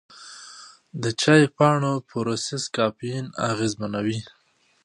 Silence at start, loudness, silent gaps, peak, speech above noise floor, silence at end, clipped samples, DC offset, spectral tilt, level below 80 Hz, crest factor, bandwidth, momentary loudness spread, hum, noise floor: 0.15 s; -23 LUFS; none; -2 dBFS; 23 dB; 0.55 s; under 0.1%; under 0.1%; -5 dB/octave; -62 dBFS; 22 dB; 11 kHz; 23 LU; none; -46 dBFS